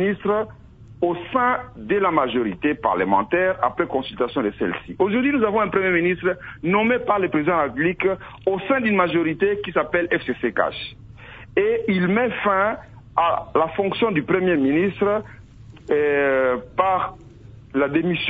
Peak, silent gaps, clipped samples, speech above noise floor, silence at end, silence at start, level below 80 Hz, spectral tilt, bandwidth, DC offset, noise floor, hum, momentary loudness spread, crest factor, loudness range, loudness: -2 dBFS; none; under 0.1%; 21 dB; 0 s; 0 s; -50 dBFS; -8.5 dB/octave; 4.8 kHz; under 0.1%; -42 dBFS; none; 7 LU; 18 dB; 2 LU; -21 LUFS